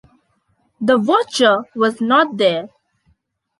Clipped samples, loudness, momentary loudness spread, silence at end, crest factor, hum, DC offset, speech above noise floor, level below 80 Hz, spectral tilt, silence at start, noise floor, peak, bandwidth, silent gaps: under 0.1%; -16 LUFS; 8 LU; 0.95 s; 16 dB; none; under 0.1%; 48 dB; -64 dBFS; -4 dB/octave; 0.8 s; -64 dBFS; -2 dBFS; 11.5 kHz; none